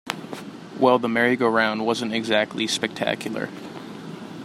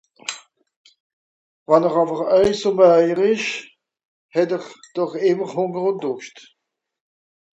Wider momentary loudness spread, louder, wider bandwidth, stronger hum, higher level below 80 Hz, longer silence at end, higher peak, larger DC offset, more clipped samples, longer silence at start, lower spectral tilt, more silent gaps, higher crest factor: about the same, 17 LU vs 17 LU; second, -22 LUFS vs -19 LUFS; first, 15 kHz vs 8.2 kHz; neither; second, -68 dBFS vs -58 dBFS; second, 0 s vs 1.25 s; about the same, -2 dBFS vs 0 dBFS; neither; neither; second, 0.05 s vs 0.3 s; about the same, -4 dB/octave vs -5 dB/octave; second, none vs 0.76-0.84 s, 1.00-1.66 s, 4.05-4.29 s; about the same, 22 dB vs 20 dB